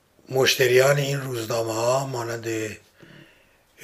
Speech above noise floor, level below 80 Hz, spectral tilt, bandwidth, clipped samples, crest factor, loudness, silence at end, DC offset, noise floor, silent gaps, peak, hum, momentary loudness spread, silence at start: 36 dB; -64 dBFS; -4 dB/octave; 15.5 kHz; under 0.1%; 20 dB; -22 LUFS; 1.05 s; under 0.1%; -58 dBFS; none; -4 dBFS; none; 12 LU; 0.3 s